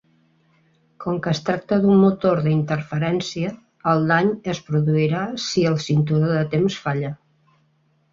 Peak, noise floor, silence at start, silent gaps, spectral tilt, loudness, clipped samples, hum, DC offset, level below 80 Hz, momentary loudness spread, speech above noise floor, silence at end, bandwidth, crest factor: -4 dBFS; -63 dBFS; 1 s; none; -6.5 dB/octave; -21 LUFS; under 0.1%; none; under 0.1%; -58 dBFS; 10 LU; 43 dB; 0.95 s; 7.6 kHz; 18 dB